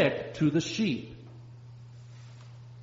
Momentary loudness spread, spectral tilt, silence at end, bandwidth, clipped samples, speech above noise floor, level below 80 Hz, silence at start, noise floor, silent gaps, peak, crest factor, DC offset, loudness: 21 LU; -5.5 dB/octave; 0 s; 7.6 kHz; under 0.1%; 19 dB; -64 dBFS; 0 s; -48 dBFS; none; -12 dBFS; 20 dB; under 0.1%; -29 LUFS